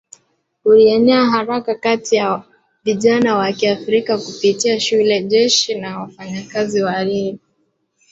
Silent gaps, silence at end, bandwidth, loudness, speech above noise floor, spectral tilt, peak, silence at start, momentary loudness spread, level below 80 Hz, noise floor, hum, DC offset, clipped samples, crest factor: none; 0.75 s; 8 kHz; -16 LUFS; 50 dB; -4 dB/octave; -2 dBFS; 0.65 s; 13 LU; -60 dBFS; -65 dBFS; none; under 0.1%; under 0.1%; 16 dB